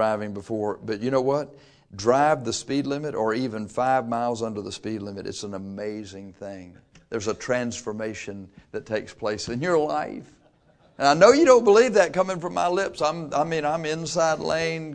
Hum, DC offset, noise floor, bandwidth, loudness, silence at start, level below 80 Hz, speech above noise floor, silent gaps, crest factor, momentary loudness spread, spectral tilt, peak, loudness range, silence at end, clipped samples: none; under 0.1%; -59 dBFS; 10 kHz; -24 LUFS; 0 s; -58 dBFS; 35 dB; none; 22 dB; 19 LU; -4.5 dB/octave; -2 dBFS; 12 LU; 0 s; under 0.1%